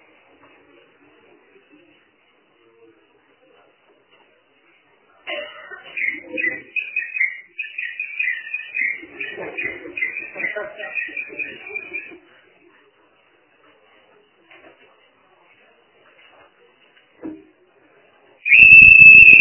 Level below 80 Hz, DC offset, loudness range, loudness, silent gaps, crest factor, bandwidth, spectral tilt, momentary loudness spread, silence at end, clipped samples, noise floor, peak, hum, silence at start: -50 dBFS; under 0.1%; 24 LU; -10 LUFS; none; 18 dB; 4 kHz; -1 dB/octave; 27 LU; 0 s; 0.2%; -59 dBFS; 0 dBFS; none; 5.25 s